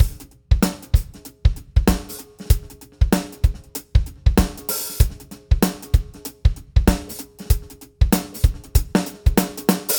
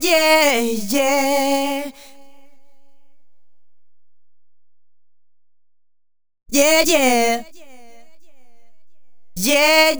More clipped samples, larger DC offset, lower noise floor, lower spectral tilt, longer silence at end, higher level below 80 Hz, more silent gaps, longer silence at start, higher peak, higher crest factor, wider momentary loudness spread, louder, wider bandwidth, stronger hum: neither; neither; second, -36 dBFS vs -74 dBFS; first, -5.5 dB/octave vs -1.5 dB/octave; about the same, 0 s vs 0 s; first, -22 dBFS vs -54 dBFS; neither; about the same, 0 s vs 0 s; about the same, 0 dBFS vs 0 dBFS; about the same, 20 dB vs 20 dB; about the same, 11 LU vs 12 LU; second, -22 LUFS vs -16 LUFS; about the same, over 20 kHz vs over 20 kHz; neither